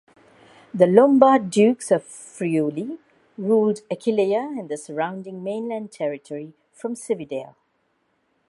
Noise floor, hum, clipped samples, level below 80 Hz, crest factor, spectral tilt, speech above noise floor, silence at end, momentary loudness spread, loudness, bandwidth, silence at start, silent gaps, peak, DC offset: -69 dBFS; none; under 0.1%; -70 dBFS; 22 dB; -6.5 dB/octave; 48 dB; 1 s; 19 LU; -21 LUFS; 11.5 kHz; 0.75 s; none; 0 dBFS; under 0.1%